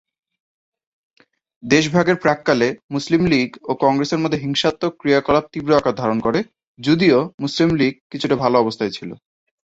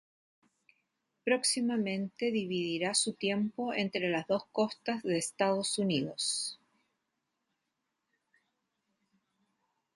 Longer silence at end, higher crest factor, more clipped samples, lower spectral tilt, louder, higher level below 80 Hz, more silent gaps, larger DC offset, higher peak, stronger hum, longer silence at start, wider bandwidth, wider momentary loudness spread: second, 0.6 s vs 3.4 s; about the same, 18 dB vs 20 dB; neither; first, -5.5 dB/octave vs -3.5 dB/octave; first, -18 LUFS vs -32 LUFS; first, -50 dBFS vs -78 dBFS; first, 2.84-2.89 s, 6.67-6.75 s, 7.34-7.38 s, 8.01-8.10 s vs none; neither; first, -2 dBFS vs -14 dBFS; neither; first, 1.65 s vs 1.25 s; second, 8 kHz vs 12 kHz; first, 9 LU vs 5 LU